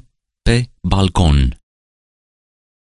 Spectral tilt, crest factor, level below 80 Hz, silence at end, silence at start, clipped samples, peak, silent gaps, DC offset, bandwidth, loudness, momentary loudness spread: -6 dB/octave; 18 dB; -22 dBFS; 1.25 s; 0.45 s; under 0.1%; 0 dBFS; none; under 0.1%; 11.5 kHz; -16 LUFS; 7 LU